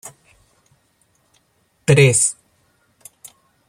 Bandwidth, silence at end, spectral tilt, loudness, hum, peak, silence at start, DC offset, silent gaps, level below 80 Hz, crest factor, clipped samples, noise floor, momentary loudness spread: 15.5 kHz; 1.35 s; -4 dB/octave; -15 LUFS; none; -2 dBFS; 0.05 s; under 0.1%; none; -54 dBFS; 20 dB; under 0.1%; -63 dBFS; 27 LU